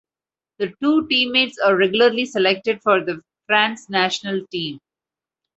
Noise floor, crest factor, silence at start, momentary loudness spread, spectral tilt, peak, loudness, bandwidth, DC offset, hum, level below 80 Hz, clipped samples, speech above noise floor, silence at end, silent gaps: under -90 dBFS; 18 dB; 0.6 s; 12 LU; -4 dB/octave; -2 dBFS; -19 LUFS; 8.2 kHz; under 0.1%; none; -66 dBFS; under 0.1%; over 71 dB; 0.8 s; none